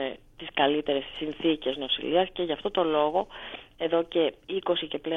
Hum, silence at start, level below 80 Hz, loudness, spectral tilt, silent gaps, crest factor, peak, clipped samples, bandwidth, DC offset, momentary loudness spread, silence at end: none; 0 s; -56 dBFS; -28 LUFS; -6.5 dB/octave; none; 18 dB; -10 dBFS; under 0.1%; 4.1 kHz; under 0.1%; 10 LU; 0 s